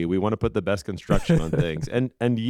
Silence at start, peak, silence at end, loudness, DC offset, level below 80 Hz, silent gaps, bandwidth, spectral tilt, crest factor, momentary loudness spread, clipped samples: 0 s; -4 dBFS; 0 s; -24 LUFS; under 0.1%; -36 dBFS; none; 13 kHz; -7 dB/octave; 18 dB; 5 LU; under 0.1%